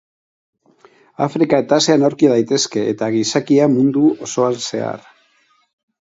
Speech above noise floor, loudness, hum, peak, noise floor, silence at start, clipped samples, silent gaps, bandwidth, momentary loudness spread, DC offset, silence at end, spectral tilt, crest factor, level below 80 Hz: 43 dB; -16 LUFS; none; 0 dBFS; -59 dBFS; 1.2 s; under 0.1%; none; 8 kHz; 9 LU; under 0.1%; 1.15 s; -5 dB/octave; 16 dB; -64 dBFS